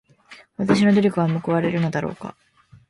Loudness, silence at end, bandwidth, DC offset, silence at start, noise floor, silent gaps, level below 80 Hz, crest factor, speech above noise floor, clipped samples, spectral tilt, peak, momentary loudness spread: -20 LUFS; 0.6 s; 11.5 kHz; under 0.1%; 0.3 s; -48 dBFS; none; -56 dBFS; 18 dB; 29 dB; under 0.1%; -7.5 dB/octave; -4 dBFS; 20 LU